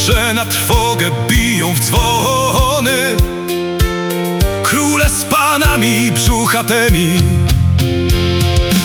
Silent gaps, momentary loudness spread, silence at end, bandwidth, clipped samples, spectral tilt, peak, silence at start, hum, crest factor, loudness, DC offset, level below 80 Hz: none; 4 LU; 0 s; over 20 kHz; under 0.1%; -4 dB/octave; 0 dBFS; 0 s; none; 12 dB; -13 LUFS; under 0.1%; -20 dBFS